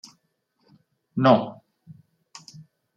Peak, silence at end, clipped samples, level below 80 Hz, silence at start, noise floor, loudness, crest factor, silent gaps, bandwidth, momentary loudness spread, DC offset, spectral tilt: -4 dBFS; 1.45 s; under 0.1%; -74 dBFS; 1.15 s; -72 dBFS; -21 LUFS; 24 dB; none; 8.6 kHz; 26 LU; under 0.1%; -7 dB/octave